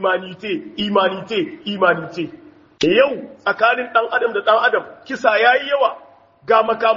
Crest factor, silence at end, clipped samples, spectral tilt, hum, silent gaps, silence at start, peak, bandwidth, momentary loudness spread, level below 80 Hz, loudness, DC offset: 18 dB; 0 s; under 0.1%; -1.5 dB/octave; none; none; 0 s; 0 dBFS; 7.4 kHz; 11 LU; -64 dBFS; -17 LUFS; under 0.1%